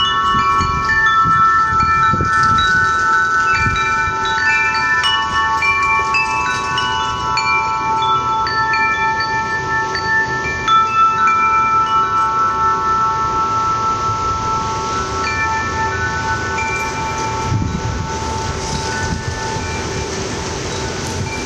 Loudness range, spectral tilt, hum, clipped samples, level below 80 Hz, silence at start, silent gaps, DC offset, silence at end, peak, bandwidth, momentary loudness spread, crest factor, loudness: 7 LU; -3.5 dB/octave; none; under 0.1%; -34 dBFS; 0 s; none; under 0.1%; 0 s; -4 dBFS; 12 kHz; 9 LU; 12 dB; -15 LUFS